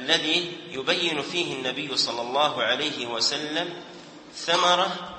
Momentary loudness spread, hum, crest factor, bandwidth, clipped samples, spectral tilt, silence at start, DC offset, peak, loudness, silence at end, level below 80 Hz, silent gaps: 12 LU; none; 22 dB; 8.8 kHz; under 0.1%; -2 dB/octave; 0 s; under 0.1%; -6 dBFS; -24 LUFS; 0 s; -70 dBFS; none